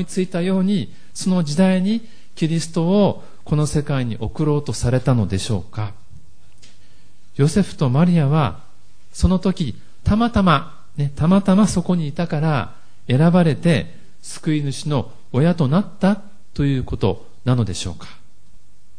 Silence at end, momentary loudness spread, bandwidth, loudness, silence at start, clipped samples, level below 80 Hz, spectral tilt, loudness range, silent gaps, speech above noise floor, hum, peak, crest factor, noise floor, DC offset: 0.4 s; 12 LU; 10.5 kHz; -19 LUFS; 0 s; under 0.1%; -38 dBFS; -7 dB/octave; 4 LU; none; 36 dB; none; -2 dBFS; 18 dB; -54 dBFS; 3%